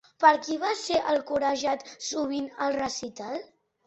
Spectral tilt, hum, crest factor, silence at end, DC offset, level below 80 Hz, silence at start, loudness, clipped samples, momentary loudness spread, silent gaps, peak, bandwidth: -2.5 dB/octave; none; 22 dB; 0.4 s; under 0.1%; -66 dBFS; 0.2 s; -27 LUFS; under 0.1%; 14 LU; none; -6 dBFS; 8.2 kHz